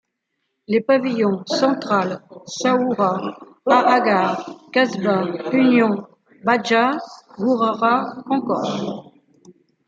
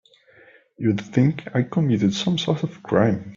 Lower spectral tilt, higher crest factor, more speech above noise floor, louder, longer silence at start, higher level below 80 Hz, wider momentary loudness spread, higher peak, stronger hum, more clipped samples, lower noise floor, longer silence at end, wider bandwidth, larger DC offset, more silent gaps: second, -5.5 dB/octave vs -7 dB/octave; about the same, 18 dB vs 18 dB; first, 56 dB vs 32 dB; first, -19 LUFS vs -22 LUFS; about the same, 0.7 s vs 0.8 s; second, -68 dBFS vs -58 dBFS; first, 12 LU vs 5 LU; about the same, -2 dBFS vs -4 dBFS; neither; neither; first, -75 dBFS vs -53 dBFS; first, 0.85 s vs 0 s; about the same, 7.8 kHz vs 7.6 kHz; neither; neither